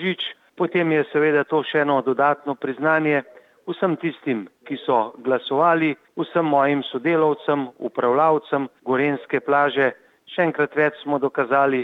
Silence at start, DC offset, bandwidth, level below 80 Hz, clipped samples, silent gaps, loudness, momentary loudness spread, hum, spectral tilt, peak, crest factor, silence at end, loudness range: 0 s; under 0.1%; 4.8 kHz; -76 dBFS; under 0.1%; none; -21 LUFS; 8 LU; none; -8 dB/octave; -6 dBFS; 16 dB; 0 s; 2 LU